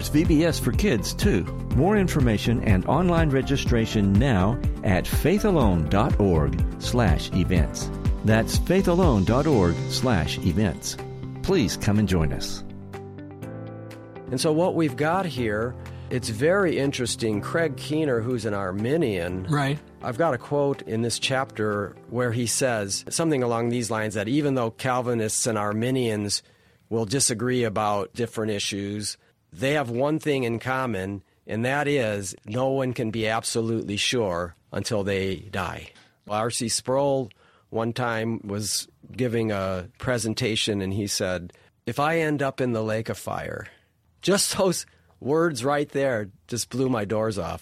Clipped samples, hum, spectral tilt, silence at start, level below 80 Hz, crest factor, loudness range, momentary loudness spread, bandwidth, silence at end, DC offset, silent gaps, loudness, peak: under 0.1%; none; -5 dB/octave; 0 s; -36 dBFS; 18 dB; 5 LU; 10 LU; 16 kHz; 0 s; under 0.1%; none; -24 LUFS; -6 dBFS